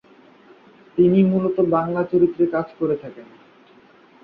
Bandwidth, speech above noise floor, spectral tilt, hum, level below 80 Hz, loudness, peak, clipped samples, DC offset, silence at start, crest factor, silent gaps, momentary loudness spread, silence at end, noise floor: 4.6 kHz; 32 dB; -11.5 dB/octave; none; -60 dBFS; -20 LUFS; -6 dBFS; under 0.1%; under 0.1%; 0.95 s; 16 dB; none; 11 LU; 1 s; -51 dBFS